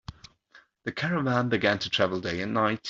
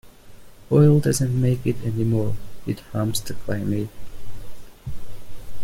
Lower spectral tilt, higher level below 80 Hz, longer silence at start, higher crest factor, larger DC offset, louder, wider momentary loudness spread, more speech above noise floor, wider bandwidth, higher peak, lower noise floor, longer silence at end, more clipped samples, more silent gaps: about the same, -5.5 dB/octave vs -6.5 dB/octave; second, -58 dBFS vs -42 dBFS; about the same, 0.1 s vs 0.05 s; about the same, 20 dB vs 16 dB; neither; second, -27 LUFS vs -22 LUFS; second, 11 LU vs 23 LU; first, 32 dB vs 21 dB; second, 7.8 kHz vs 16 kHz; about the same, -8 dBFS vs -6 dBFS; first, -59 dBFS vs -41 dBFS; about the same, 0 s vs 0 s; neither; neither